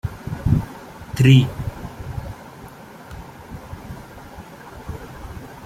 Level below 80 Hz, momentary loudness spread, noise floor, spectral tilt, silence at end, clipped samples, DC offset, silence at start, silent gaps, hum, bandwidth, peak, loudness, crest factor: -38 dBFS; 25 LU; -40 dBFS; -7 dB/octave; 0 s; under 0.1%; under 0.1%; 0.05 s; none; none; 15 kHz; -2 dBFS; -20 LUFS; 22 dB